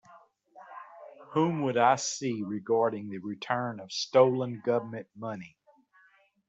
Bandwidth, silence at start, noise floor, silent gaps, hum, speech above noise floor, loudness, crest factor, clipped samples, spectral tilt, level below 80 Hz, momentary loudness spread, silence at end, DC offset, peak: 8.2 kHz; 0.1 s; -64 dBFS; none; none; 36 dB; -29 LUFS; 20 dB; under 0.1%; -5 dB/octave; -76 dBFS; 23 LU; 1 s; under 0.1%; -10 dBFS